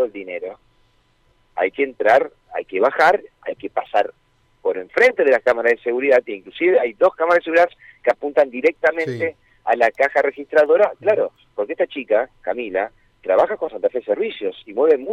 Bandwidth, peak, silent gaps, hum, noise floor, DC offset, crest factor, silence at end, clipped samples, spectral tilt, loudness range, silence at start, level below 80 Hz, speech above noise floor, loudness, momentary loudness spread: 10 kHz; -4 dBFS; none; none; -60 dBFS; under 0.1%; 14 dB; 0 s; under 0.1%; -5.5 dB/octave; 4 LU; 0 s; -62 dBFS; 41 dB; -19 LUFS; 12 LU